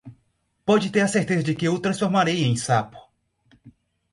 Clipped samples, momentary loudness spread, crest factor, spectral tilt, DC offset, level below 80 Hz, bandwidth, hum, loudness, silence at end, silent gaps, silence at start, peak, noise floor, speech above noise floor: under 0.1%; 4 LU; 18 dB; -5.5 dB/octave; under 0.1%; -60 dBFS; 11.5 kHz; none; -22 LUFS; 0.45 s; none; 0.05 s; -6 dBFS; -69 dBFS; 48 dB